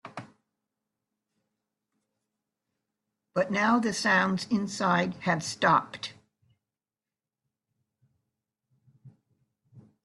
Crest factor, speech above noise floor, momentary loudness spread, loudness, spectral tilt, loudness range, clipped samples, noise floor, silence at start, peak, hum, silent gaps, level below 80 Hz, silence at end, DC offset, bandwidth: 24 dB; over 64 dB; 15 LU; -26 LUFS; -4.5 dB/octave; 10 LU; under 0.1%; under -90 dBFS; 0.05 s; -8 dBFS; none; none; -72 dBFS; 0.25 s; under 0.1%; 12 kHz